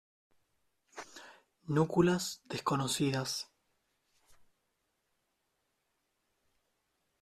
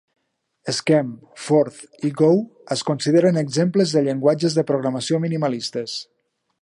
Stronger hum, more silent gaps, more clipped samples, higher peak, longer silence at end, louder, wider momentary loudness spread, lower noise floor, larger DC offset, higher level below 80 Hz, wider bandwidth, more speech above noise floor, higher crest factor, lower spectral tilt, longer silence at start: neither; neither; neither; second, -14 dBFS vs -4 dBFS; first, 3.75 s vs 0.6 s; second, -33 LUFS vs -20 LUFS; first, 22 LU vs 10 LU; first, -81 dBFS vs -67 dBFS; neither; about the same, -68 dBFS vs -70 dBFS; first, 14 kHz vs 11.5 kHz; about the same, 49 dB vs 48 dB; first, 24 dB vs 16 dB; about the same, -5 dB/octave vs -6 dB/octave; first, 0.95 s vs 0.65 s